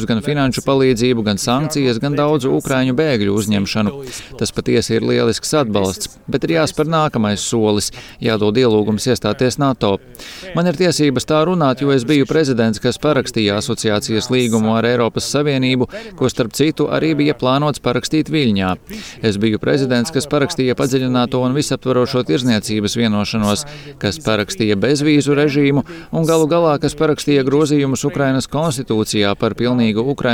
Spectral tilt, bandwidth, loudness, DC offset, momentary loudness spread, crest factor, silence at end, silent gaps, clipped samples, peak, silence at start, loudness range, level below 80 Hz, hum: -5.5 dB/octave; 17 kHz; -16 LUFS; under 0.1%; 6 LU; 14 dB; 0 s; none; under 0.1%; -2 dBFS; 0 s; 2 LU; -44 dBFS; none